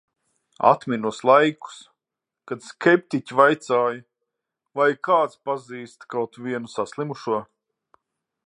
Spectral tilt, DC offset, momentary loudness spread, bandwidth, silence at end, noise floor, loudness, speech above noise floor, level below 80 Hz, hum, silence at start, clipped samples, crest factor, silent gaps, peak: -5.5 dB/octave; under 0.1%; 17 LU; 10.5 kHz; 1.05 s; -87 dBFS; -22 LUFS; 65 dB; -74 dBFS; none; 0.6 s; under 0.1%; 22 dB; none; -2 dBFS